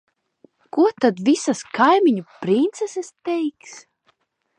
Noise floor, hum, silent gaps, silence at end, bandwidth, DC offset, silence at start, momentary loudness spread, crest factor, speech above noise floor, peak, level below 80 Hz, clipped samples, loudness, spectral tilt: -66 dBFS; none; none; 0.8 s; 10.5 kHz; under 0.1%; 0.75 s; 12 LU; 18 dB; 46 dB; -2 dBFS; -72 dBFS; under 0.1%; -20 LUFS; -5 dB/octave